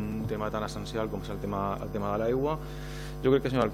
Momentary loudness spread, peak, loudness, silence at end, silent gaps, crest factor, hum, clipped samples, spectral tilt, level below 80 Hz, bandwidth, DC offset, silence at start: 10 LU; -12 dBFS; -31 LUFS; 0 s; none; 18 dB; none; under 0.1%; -7 dB/octave; -44 dBFS; 16 kHz; under 0.1%; 0 s